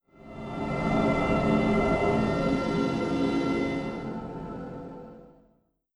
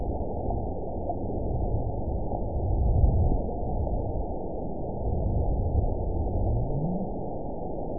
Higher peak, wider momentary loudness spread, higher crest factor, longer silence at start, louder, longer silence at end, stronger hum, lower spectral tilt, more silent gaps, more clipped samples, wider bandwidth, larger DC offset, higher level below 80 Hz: about the same, -12 dBFS vs -10 dBFS; first, 17 LU vs 8 LU; about the same, 16 dB vs 18 dB; first, 0.2 s vs 0 s; first, -27 LUFS vs -30 LUFS; first, 0.65 s vs 0 s; neither; second, -7 dB/octave vs -18.5 dB/octave; neither; neither; first, 11 kHz vs 1 kHz; second, under 0.1% vs 2%; second, -44 dBFS vs -30 dBFS